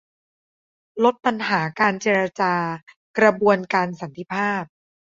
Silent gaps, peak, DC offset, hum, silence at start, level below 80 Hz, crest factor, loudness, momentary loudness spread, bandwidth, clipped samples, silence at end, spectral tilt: 2.83-2.87 s, 2.96-3.14 s; -2 dBFS; under 0.1%; none; 0.95 s; -66 dBFS; 20 dB; -21 LUFS; 12 LU; 7.6 kHz; under 0.1%; 0.5 s; -5.5 dB/octave